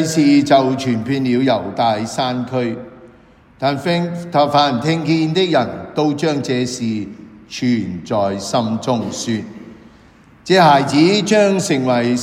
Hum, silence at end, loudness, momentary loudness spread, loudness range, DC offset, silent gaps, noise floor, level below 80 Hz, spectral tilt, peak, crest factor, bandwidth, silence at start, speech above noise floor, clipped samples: none; 0 s; -16 LUFS; 10 LU; 5 LU; under 0.1%; none; -47 dBFS; -54 dBFS; -5.5 dB/octave; 0 dBFS; 16 dB; 15 kHz; 0 s; 31 dB; under 0.1%